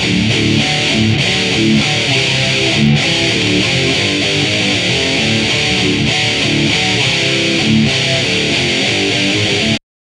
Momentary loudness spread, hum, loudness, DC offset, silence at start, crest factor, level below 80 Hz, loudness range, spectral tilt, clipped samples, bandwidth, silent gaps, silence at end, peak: 1 LU; none; -12 LUFS; under 0.1%; 0 s; 14 dB; -38 dBFS; 0 LU; -3.5 dB/octave; under 0.1%; 12.5 kHz; none; 0.3 s; 0 dBFS